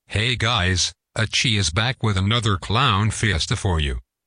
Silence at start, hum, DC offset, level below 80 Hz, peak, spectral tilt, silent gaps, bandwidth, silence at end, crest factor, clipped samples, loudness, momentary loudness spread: 0.1 s; none; under 0.1%; -36 dBFS; -6 dBFS; -4 dB/octave; none; 10.5 kHz; 0.25 s; 14 dB; under 0.1%; -20 LUFS; 4 LU